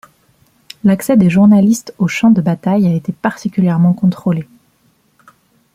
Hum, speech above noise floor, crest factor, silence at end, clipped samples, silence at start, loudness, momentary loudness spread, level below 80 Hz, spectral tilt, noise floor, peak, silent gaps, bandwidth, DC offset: none; 44 dB; 12 dB; 1.3 s; under 0.1%; 0.85 s; -13 LUFS; 9 LU; -52 dBFS; -7.5 dB/octave; -56 dBFS; -2 dBFS; none; 15.5 kHz; under 0.1%